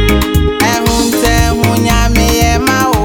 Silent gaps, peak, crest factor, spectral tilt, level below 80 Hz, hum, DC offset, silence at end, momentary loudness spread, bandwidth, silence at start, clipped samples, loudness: none; 0 dBFS; 10 dB; -4.5 dB/octave; -16 dBFS; none; 1%; 0 s; 1 LU; over 20 kHz; 0 s; under 0.1%; -11 LUFS